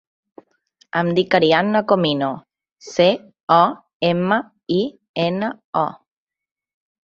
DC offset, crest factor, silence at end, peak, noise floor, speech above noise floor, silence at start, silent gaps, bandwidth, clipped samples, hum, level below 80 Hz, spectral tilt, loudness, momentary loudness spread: under 0.1%; 18 dB; 1.1 s; -2 dBFS; -60 dBFS; 42 dB; 0.95 s; 3.43-3.47 s, 3.95-4.00 s, 5.09-5.14 s, 5.65-5.73 s; 7.6 kHz; under 0.1%; none; -62 dBFS; -6 dB/octave; -19 LUFS; 10 LU